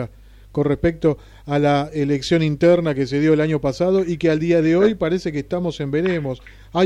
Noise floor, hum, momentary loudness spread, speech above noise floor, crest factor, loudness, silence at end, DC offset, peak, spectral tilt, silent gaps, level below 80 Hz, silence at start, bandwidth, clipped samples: -40 dBFS; none; 9 LU; 21 dB; 12 dB; -19 LUFS; 0 s; under 0.1%; -6 dBFS; -7 dB/octave; none; -42 dBFS; 0 s; 10.5 kHz; under 0.1%